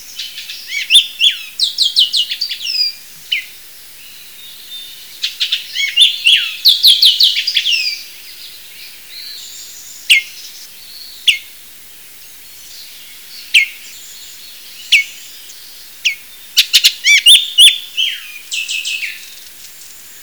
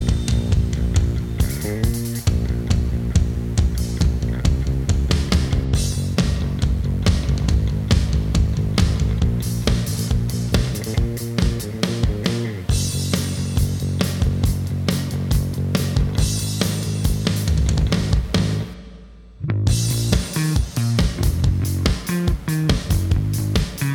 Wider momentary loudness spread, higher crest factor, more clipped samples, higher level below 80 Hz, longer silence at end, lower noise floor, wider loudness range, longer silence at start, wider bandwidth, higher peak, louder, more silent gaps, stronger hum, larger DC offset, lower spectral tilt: first, 25 LU vs 3 LU; about the same, 16 dB vs 18 dB; neither; second, -64 dBFS vs -24 dBFS; about the same, 0 s vs 0 s; second, -37 dBFS vs -41 dBFS; first, 10 LU vs 2 LU; about the same, 0 s vs 0 s; about the same, over 20 kHz vs 19 kHz; about the same, 0 dBFS vs -2 dBFS; first, -10 LUFS vs -21 LUFS; neither; neither; first, 0.5% vs under 0.1%; second, 5 dB/octave vs -5.5 dB/octave